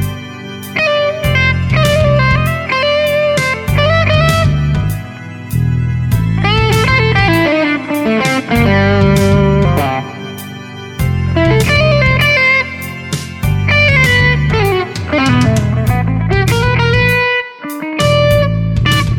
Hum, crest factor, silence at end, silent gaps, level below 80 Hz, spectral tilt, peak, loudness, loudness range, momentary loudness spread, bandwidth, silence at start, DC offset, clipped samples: none; 12 dB; 0 s; none; -26 dBFS; -6 dB/octave; 0 dBFS; -12 LUFS; 2 LU; 11 LU; 18.5 kHz; 0 s; 0.5%; under 0.1%